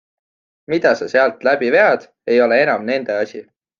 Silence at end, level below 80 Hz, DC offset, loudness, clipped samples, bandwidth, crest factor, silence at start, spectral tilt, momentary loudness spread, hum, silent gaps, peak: 0.4 s; -66 dBFS; under 0.1%; -16 LUFS; under 0.1%; 7.2 kHz; 16 dB; 0.7 s; -5.5 dB/octave; 9 LU; none; none; 0 dBFS